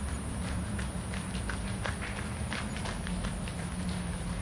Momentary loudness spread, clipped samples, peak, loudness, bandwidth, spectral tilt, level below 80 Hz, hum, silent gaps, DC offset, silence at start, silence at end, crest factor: 1 LU; under 0.1%; -16 dBFS; -36 LUFS; 11.5 kHz; -5 dB/octave; -40 dBFS; none; none; under 0.1%; 0 s; 0 s; 20 dB